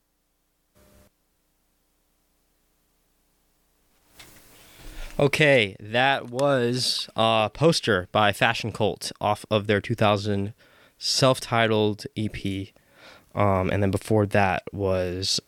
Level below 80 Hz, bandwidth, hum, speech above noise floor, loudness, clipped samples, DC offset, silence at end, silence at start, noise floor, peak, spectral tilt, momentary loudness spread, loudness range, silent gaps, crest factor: -52 dBFS; 18.5 kHz; none; 48 dB; -23 LUFS; under 0.1%; under 0.1%; 0.1 s; 4.2 s; -71 dBFS; -4 dBFS; -4.5 dB/octave; 10 LU; 4 LU; none; 22 dB